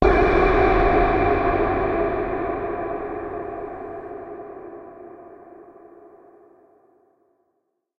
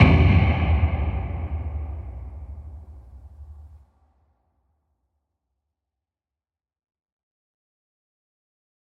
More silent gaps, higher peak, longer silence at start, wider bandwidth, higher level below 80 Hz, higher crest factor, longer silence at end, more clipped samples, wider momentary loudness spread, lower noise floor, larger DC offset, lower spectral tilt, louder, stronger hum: neither; about the same, -2 dBFS vs -2 dBFS; about the same, 0 s vs 0 s; first, 6.6 kHz vs 4.8 kHz; about the same, -32 dBFS vs -32 dBFS; about the same, 22 dB vs 24 dB; second, 2.1 s vs 5.25 s; neither; second, 23 LU vs 26 LU; second, -73 dBFS vs under -90 dBFS; neither; about the same, -8.5 dB/octave vs -9 dB/octave; about the same, -21 LUFS vs -22 LUFS; neither